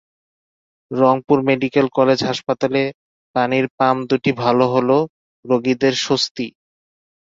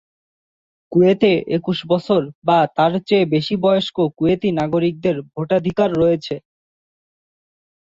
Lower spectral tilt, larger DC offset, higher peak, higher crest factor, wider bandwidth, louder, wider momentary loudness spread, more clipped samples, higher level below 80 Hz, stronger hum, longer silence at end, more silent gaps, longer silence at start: second, -5.5 dB/octave vs -7.5 dB/octave; neither; about the same, -2 dBFS vs -2 dBFS; about the same, 18 dB vs 16 dB; about the same, 7.8 kHz vs 7.6 kHz; about the same, -18 LUFS vs -18 LUFS; about the same, 8 LU vs 6 LU; neither; second, -60 dBFS vs -52 dBFS; neither; second, 0.9 s vs 1.45 s; first, 2.94-3.34 s, 3.70-3.78 s, 5.09-5.43 s, 6.31-6.35 s vs 2.35-2.42 s; about the same, 0.9 s vs 0.9 s